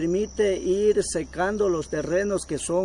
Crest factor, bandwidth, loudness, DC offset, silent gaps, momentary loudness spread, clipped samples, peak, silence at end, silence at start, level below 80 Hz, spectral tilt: 12 dB; 11 kHz; -24 LUFS; under 0.1%; none; 5 LU; under 0.1%; -10 dBFS; 0 s; 0 s; -46 dBFS; -5 dB/octave